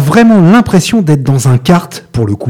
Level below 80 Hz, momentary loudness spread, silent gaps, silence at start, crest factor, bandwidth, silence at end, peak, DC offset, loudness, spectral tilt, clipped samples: -38 dBFS; 10 LU; none; 0 s; 8 dB; 16 kHz; 0 s; 0 dBFS; under 0.1%; -8 LUFS; -6.5 dB/octave; 0.6%